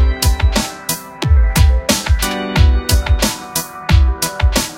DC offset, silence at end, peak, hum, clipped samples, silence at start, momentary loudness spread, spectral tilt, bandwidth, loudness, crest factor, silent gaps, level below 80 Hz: under 0.1%; 0 s; 0 dBFS; none; under 0.1%; 0 s; 7 LU; -4 dB/octave; 17 kHz; -15 LUFS; 14 dB; none; -16 dBFS